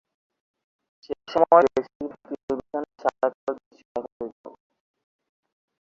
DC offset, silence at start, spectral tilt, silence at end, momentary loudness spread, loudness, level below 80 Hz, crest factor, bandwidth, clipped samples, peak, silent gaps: under 0.1%; 1.1 s; -6 dB/octave; 1.35 s; 20 LU; -24 LUFS; -64 dBFS; 24 dB; 7.4 kHz; under 0.1%; -2 dBFS; 1.95-2.00 s, 2.43-2.48 s, 3.34-3.47 s, 3.66-3.71 s, 3.85-3.95 s, 4.12-4.20 s, 4.32-4.44 s